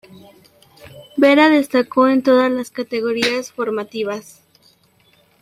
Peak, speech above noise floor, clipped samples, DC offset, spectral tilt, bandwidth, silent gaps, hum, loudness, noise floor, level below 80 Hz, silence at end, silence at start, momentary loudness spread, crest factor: 0 dBFS; 39 dB; under 0.1%; under 0.1%; -4 dB/octave; 15 kHz; none; none; -16 LUFS; -56 dBFS; -64 dBFS; 1.2 s; 0.85 s; 12 LU; 18 dB